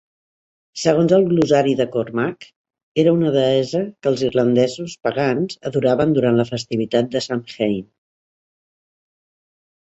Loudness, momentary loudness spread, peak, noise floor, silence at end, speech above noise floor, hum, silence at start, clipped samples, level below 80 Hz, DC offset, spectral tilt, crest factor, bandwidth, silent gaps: -19 LUFS; 8 LU; -2 dBFS; under -90 dBFS; 2.05 s; over 72 dB; none; 0.75 s; under 0.1%; -58 dBFS; under 0.1%; -6.5 dB/octave; 18 dB; 8.2 kHz; 2.56-2.65 s, 2.83-2.95 s